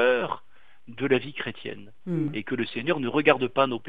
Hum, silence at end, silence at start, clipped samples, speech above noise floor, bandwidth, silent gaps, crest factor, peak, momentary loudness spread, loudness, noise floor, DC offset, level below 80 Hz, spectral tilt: none; 0 s; 0 s; under 0.1%; 34 dB; 4.9 kHz; none; 24 dB; -4 dBFS; 16 LU; -26 LUFS; -60 dBFS; 0.7%; -68 dBFS; -8 dB/octave